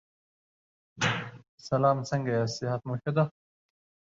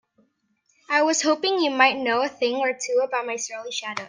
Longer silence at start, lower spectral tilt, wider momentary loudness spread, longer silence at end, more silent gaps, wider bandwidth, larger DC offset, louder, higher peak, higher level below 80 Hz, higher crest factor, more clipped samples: about the same, 0.95 s vs 0.9 s; first, -5.5 dB/octave vs -1 dB/octave; about the same, 8 LU vs 10 LU; first, 0.85 s vs 0 s; first, 1.48-1.58 s vs none; second, 7.8 kHz vs 10 kHz; neither; second, -29 LUFS vs -22 LUFS; second, -12 dBFS vs -2 dBFS; first, -64 dBFS vs -78 dBFS; about the same, 20 dB vs 22 dB; neither